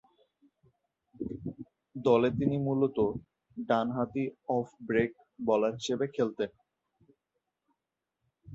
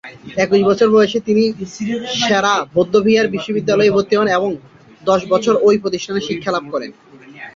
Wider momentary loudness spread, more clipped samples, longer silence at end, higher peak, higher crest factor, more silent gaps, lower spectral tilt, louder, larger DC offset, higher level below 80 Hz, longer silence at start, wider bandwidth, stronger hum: first, 16 LU vs 11 LU; neither; about the same, 0 s vs 0.05 s; second, -12 dBFS vs -2 dBFS; first, 22 dB vs 14 dB; neither; first, -7 dB/octave vs -5 dB/octave; second, -31 LUFS vs -16 LUFS; neither; second, -64 dBFS vs -54 dBFS; first, 1.2 s vs 0.05 s; about the same, 8 kHz vs 7.6 kHz; neither